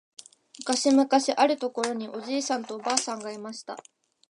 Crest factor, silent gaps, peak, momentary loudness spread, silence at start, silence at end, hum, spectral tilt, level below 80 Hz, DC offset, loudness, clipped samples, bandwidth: 22 dB; none; -4 dBFS; 16 LU; 0.6 s; 0.5 s; none; -2 dB/octave; -80 dBFS; under 0.1%; -26 LUFS; under 0.1%; 11.5 kHz